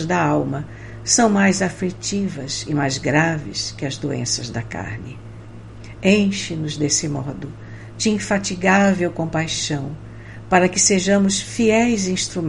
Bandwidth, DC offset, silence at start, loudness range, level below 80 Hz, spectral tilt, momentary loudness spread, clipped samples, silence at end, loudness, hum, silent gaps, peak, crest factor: 11.5 kHz; under 0.1%; 0 s; 5 LU; -46 dBFS; -4 dB/octave; 19 LU; under 0.1%; 0 s; -19 LUFS; none; none; -2 dBFS; 18 dB